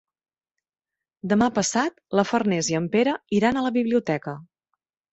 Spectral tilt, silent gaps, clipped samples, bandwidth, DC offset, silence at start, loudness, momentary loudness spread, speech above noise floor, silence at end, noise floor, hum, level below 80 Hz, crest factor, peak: -4.5 dB/octave; none; under 0.1%; 8.2 kHz; under 0.1%; 1.25 s; -23 LUFS; 7 LU; 57 dB; 0.7 s; -80 dBFS; none; -60 dBFS; 20 dB; -6 dBFS